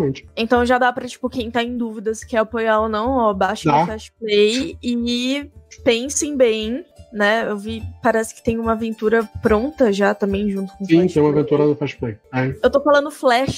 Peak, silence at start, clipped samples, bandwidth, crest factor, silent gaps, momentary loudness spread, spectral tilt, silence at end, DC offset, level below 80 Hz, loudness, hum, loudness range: -2 dBFS; 0 s; under 0.1%; 16 kHz; 16 dB; none; 9 LU; -5 dB/octave; 0 s; under 0.1%; -42 dBFS; -19 LUFS; none; 2 LU